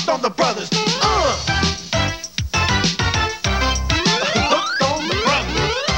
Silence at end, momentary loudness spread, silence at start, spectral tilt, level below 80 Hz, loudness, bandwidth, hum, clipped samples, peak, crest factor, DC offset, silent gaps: 0 s; 4 LU; 0 s; -3.5 dB/octave; -30 dBFS; -18 LUFS; 16.5 kHz; none; under 0.1%; -2 dBFS; 16 dB; 0.2%; none